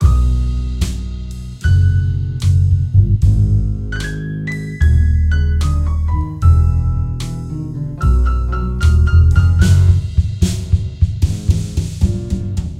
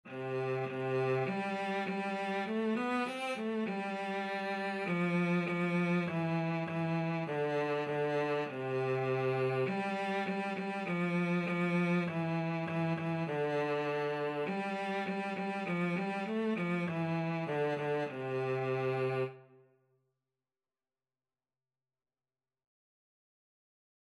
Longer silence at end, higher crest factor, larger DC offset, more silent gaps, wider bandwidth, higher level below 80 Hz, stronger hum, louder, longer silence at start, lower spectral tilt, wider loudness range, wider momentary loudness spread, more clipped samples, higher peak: second, 0 s vs 4.7 s; about the same, 14 dB vs 12 dB; neither; neither; about the same, 11 kHz vs 11 kHz; first, -18 dBFS vs -82 dBFS; neither; first, -16 LUFS vs -35 LUFS; about the same, 0 s vs 0.05 s; about the same, -7 dB/octave vs -7.5 dB/octave; about the same, 3 LU vs 3 LU; first, 11 LU vs 4 LU; neither; first, 0 dBFS vs -22 dBFS